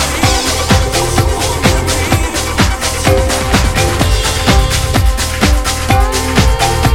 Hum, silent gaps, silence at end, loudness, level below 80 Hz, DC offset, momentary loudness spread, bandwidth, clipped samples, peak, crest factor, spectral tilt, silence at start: none; none; 0 s; -12 LUFS; -16 dBFS; 2%; 2 LU; 17 kHz; under 0.1%; 0 dBFS; 12 dB; -4 dB/octave; 0 s